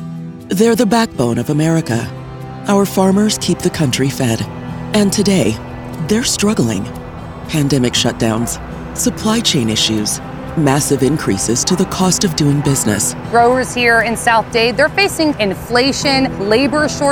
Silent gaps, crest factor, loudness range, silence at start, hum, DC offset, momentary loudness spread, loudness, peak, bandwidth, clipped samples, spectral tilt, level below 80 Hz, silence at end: none; 14 dB; 3 LU; 0 s; none; 0.3%; 11 LU; -14 LUFS; 0 dBFS; over 20 kHz; under 0.1%; -4 dB/octave; -38 dBFS; 0 s